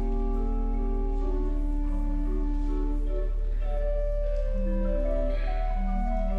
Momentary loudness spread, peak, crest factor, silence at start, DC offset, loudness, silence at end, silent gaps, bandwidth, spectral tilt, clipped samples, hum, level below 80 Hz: 2 LU; -16 dBFS; 8 dB; 0 s; under 0.1%; -31 LUFS; 0 s; none; 3.6 kHz; -9.5 dB/octave; under 0.1%; none; -26 dBFS